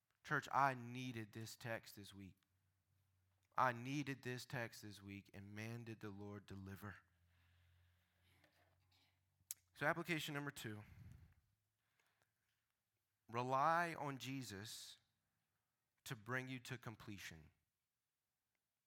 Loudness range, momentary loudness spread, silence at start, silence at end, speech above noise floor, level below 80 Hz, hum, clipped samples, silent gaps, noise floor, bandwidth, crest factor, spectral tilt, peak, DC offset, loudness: 11 LU; 18 LU; 0.25 s; 1.35 s; over 44 dB; -82 dBFS; none; under 0.1%; none; under -90 dBFS; 18 kHz; 26 dB; -4.5 dB/octave; -24 dBFS; under 0.1%; -46 LUFS